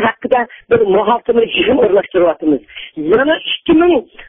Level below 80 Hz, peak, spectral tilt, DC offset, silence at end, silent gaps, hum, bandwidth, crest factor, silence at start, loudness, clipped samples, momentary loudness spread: -44 dBFS; 0 dBFS; -9 dB/octave; under 0.1%; 0.05 s; none; none; 3.8 kHz; 12 dB; 0 s; -13 LUFS; under 0.1%; 6 LU